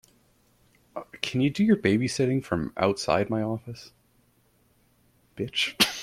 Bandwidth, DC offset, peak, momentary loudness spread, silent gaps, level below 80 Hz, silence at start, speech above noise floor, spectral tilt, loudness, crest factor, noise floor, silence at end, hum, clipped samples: 16 kHz; under 0.1%; -6 dBFS; 19 LU; none; -58 dBFS; 0.95 s; 39 dB; -4.5 dB/octave; -26 LUFS; 22 dB; -65 dBFS; 0 s; none; under 0.1%